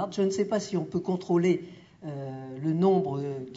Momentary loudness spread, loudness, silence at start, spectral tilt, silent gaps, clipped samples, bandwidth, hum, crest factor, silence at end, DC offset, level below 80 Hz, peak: 14 LU; -28 LUFS; 0 s; -7 dB/octave; none; under 0.1%; 7.8 kHz; none; 16 dB; 0 s; under 0.1%; -68 dBFS; -12 dBFS